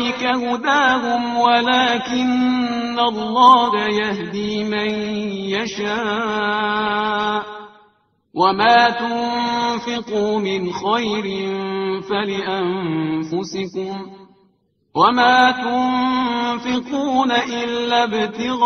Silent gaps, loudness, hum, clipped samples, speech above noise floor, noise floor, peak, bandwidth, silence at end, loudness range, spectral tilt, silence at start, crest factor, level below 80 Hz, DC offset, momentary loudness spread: none; -18 LUFS; none; under 0.1%; 43 dB; -62 dBFS; 0 dBFS; 6.8 kHz; 0 s; 6 LU; -2 dB/octave; 0 s; 18 dB; -56 dBFS; under 0.1%; 10 LU